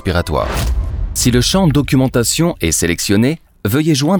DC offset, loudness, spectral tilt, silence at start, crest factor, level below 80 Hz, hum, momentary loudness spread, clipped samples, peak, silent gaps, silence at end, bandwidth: under 0.1%; -15 LUFS; -4.5 dB/octave; 0.05 s; 14 dB; -24 dBFS; none; 7 LU; under 0.1%; 0 dBFS; none; 0 s; over 20 kHz